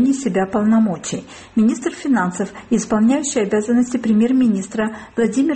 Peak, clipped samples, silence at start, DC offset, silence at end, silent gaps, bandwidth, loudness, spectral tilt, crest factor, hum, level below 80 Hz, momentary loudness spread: -6 dBFS; under 0.1%; 0 s; under 0.1%; 0 s; none; 8.8 kHz; -18 LUFS; -5.5 dB/octave; 12 dB; none; -52 dBFS; 8 LU